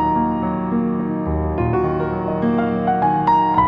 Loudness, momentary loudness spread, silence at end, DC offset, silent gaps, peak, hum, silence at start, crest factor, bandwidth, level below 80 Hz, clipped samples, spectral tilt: -19 LUFS; 6 LU; 0 s; under 0.1%; none; -4 dBFS; none; 0 s; 14 dB; 5.2 kHz; -34 dBFS; under 0.1%; -10 dB/octave